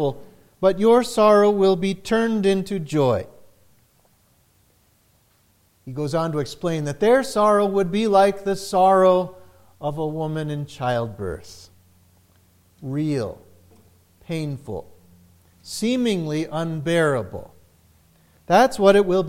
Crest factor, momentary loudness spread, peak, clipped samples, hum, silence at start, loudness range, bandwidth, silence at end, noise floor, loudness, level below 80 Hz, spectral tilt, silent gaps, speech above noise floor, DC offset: 20 dB; 16 LU; 0 dBFS; under 0.1%; none; 0 s; 12 LU; 16 kHz; 0 s; -61 dBFS; -20 LUFS; -52 dBFS; -6 dB/octave; none; 41 dB; under 0.1%